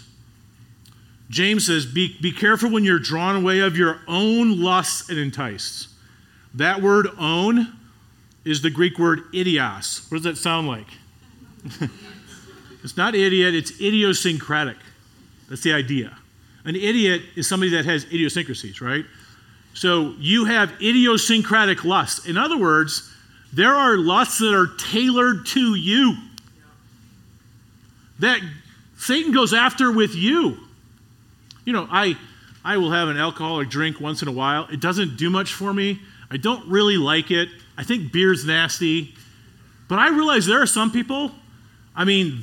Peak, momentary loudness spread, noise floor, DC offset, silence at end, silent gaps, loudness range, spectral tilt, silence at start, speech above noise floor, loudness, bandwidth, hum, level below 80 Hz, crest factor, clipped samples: -2 dBFS; 13 LU; -52 dBFS; under 0.1%; 0 s; none; 5 LU; -4 dB/octave; 1.3 s; 32 dB; -19 LUFS; 18 kHz; none; -62 dBFS; 20 dB; under 0.1%